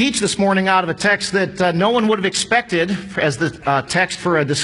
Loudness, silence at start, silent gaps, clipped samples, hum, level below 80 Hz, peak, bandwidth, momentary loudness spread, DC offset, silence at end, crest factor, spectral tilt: -17 LUFS; 0 s; none; under 0.1%; none; -50 dBFS; -2 dBFS; 11 kHz; 4 LU; under 0.1%; 0 s; 16 dB; -4 dB/octave